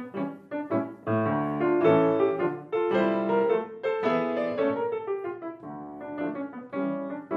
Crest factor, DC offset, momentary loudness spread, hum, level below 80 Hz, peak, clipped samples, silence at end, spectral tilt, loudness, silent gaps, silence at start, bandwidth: 18 dB; under 0.1%; 13 LU; none; -70 dBFS; -8 dBFS; under 0.1%; 0 s; -9 dB/octave; -27 LUFS; none; 0 s; 5.8 kHz